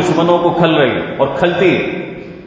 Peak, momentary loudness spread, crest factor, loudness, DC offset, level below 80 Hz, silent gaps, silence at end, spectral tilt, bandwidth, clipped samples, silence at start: 0 dBFS; 9 LU; 14 dB; -13 LUFS; under 0.1%; -46 dBFS; none; 0 s; -6.5 dB/octave; 7.8 kHz; under 0.1%; 0 s